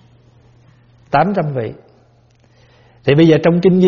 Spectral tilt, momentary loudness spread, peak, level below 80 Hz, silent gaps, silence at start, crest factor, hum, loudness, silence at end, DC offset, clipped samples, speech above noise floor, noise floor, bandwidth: -6.5 dB/octave; 12 LU; 0 dBFS; -50 dBFS; none; 1.1 s; 16 dB; none; -14 LUFS; 0 s; under 0.1%; under 0.1%; 39 dB; -51 dBFS; 6.8 kHz